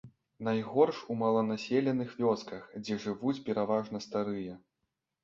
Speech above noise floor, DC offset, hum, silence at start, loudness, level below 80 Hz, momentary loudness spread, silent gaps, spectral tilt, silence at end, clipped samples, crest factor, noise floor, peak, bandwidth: 53 dB; under 0.1%; none; 0.05 s; -32 LUFS; -72 dBFS; 10 LU; none; -7 dB/octave; 0.65 s; under 0.1%; 20 dB; -85 dBFS; -12 dBFS; 7.6 kHz